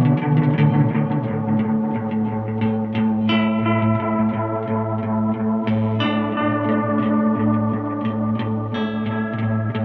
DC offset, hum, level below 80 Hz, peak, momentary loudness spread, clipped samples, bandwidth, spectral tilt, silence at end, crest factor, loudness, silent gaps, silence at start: under 0.1%; none; -52 dBFS; -6 dBFS; 6 LU; under 0.1%; 4.8 kHz; -10 dB/octave; 0 s; 14 dB; -20 LUFS; none; 0 s